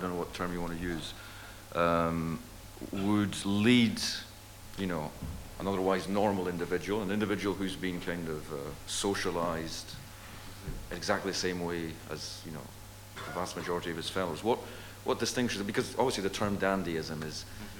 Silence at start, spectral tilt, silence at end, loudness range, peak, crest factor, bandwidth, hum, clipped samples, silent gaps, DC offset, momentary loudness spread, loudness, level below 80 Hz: 0 s; -4.5 dB/octave; 0 s; 6 LU; -12 dBFS; 20 dB; 18 kHz; none; under 0.1%; none; under 0.1%; 15 LU; -33 LUFS; -52 dBFS